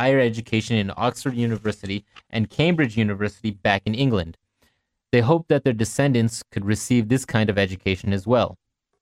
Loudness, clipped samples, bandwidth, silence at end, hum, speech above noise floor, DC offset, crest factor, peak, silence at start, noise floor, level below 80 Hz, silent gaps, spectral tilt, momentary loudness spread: -22 LUFS; under 0.1%; 14.5 kHz; 0.45 s; none; 45 dB; under 0.1%; 20 dB; -2 dBFS; 0 s; -67 dBFS; -50 dBFS; none; -6 dB/octave; 8 LU